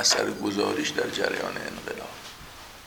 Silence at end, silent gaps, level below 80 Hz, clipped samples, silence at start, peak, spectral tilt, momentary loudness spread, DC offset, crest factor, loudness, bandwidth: 0 s; none; -58 dBFS; under 0.1%; 0 s; -8 dBFS; -2 dB/octave; 17 LU; under 0.1%; 20 dB; -28 LUFS; over 20 kHz